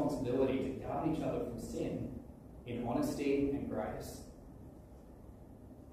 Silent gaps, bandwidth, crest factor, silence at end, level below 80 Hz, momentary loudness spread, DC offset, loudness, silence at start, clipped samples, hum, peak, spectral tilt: none; 15.5 kHz; 16 dB; 0 s; -56 dBFS; 21 LU; under 0.1%; -37 LUFS; 0 s; under 0.1%; none; -22 dBFS; -7 dB/octave